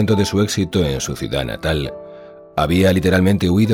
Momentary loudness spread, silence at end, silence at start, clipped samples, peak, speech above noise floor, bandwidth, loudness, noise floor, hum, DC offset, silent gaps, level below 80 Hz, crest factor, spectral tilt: 11 LU; 0 s; 0 s; under 0.1%; -2 dBFS; 22 dB; 16.5 kHz; -18 LUFS; -39 dBFS; none; under 0.1%; none; -36 dBFS; 16 dB; -5.5 dB/octave